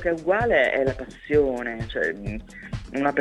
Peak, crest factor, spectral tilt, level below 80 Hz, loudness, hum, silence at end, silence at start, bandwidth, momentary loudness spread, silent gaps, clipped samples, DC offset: -8 dBFS; 16 dB; -6.5 dB/octave; -42 dBFS; -24 LUFS; none; 0 s; 0 s; 11.5 kHz; 16 LU; none; under 0.1%; under 0.1%